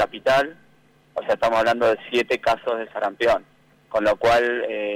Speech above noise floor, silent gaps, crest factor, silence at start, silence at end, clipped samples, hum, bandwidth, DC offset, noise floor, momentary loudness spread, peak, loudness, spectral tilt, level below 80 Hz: 36 dB; none; 10 dB; 0 s; 0 s; under 0.1%; none; 16 kHz; under 0.1%; -57 dBFS; 9 LU; -12 dBFS; -21 LUFS; -4 dB/octave; -52 dBFS